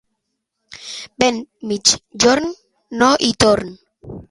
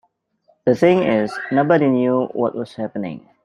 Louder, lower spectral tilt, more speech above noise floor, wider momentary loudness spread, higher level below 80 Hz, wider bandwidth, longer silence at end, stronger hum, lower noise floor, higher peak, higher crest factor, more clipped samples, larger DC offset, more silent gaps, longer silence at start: about the same, -16 LUFS vs -18 LUFS; second, -2.5 dB/octave vs -8 dB/octave; first, 58 dB vs 43 dB; first, 19 LU vs 12 LU; first, -46 dBFS vs -62 dBFS; first, 16 kHz vs 11 kHz; second, 0.1 s vs 0.25 s; neither; first, -75 dBFS vs -61 dBFS; about the same, 0 dBFS vs -2 dBFS; about the same, 18 dB vs 18 dB; neither; neither; neither; about the same, 0.7 s vs 0.65 s